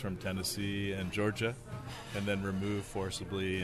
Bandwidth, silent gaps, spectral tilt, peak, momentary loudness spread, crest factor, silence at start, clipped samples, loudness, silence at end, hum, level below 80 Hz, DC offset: 13.5 kHz; none; -5 dB/octave; -20 dBFS; 7 LU; 16 dB; 0 s; under 0.1%; -36 LUFS; 0 s; none; -56 dBFS; under 0.1%